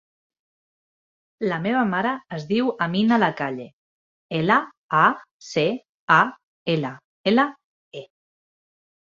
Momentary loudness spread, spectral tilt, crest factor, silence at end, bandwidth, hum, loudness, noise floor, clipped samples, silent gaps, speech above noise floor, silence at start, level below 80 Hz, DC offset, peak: 14 LU; -6 dB/octave; 22 dB; 1.15 s; 7.6 kHz; none; -22 LUFS; under -90 dBFS; under 0.1%; 3.73-4.29 s, 4.77-4.89 s, 5.31-5.40 s, 5.89-6.08 s, 6.43-6.66 s, 7.04-7.24 s, 7.64-7.91 s; over 69 dB; 1.4 s; -66 dBFS; under 0.1%; -2 dBFS